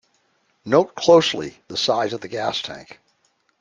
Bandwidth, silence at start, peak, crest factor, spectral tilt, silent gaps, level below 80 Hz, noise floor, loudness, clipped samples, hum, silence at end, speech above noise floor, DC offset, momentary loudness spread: 9.4 kHz; 0.65 s; -2 dBFS; 20 dB; -4 dB/octave; none; -62 dBFS; -66 dBFS; -20 LUFS; under 0.1%; none; 0.75 s; 46 dB; under 0.1%; 16 LU